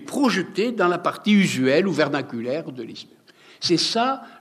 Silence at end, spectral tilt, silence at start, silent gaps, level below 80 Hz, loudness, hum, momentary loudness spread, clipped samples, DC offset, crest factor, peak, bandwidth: 0.1 s; -5 dB/octave; 0 s; none; -74 dBFS; -21 LUFS; none; 12 LU; under 0.1%; under 0.1%; 16 dB; -6 dBFS; 14.5 kHz